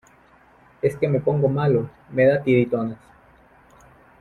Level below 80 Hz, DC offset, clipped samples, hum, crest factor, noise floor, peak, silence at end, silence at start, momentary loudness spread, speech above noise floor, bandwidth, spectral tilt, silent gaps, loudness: -56 dBFS; under 0.1%; under 0.1%; none; 18 dB; -54 dBFS; -6 dBFS; 1.25 s; 0.85 s; 9 LU; 34 dB; 11 kHz; -9 dB/octave; none; -21 LUFS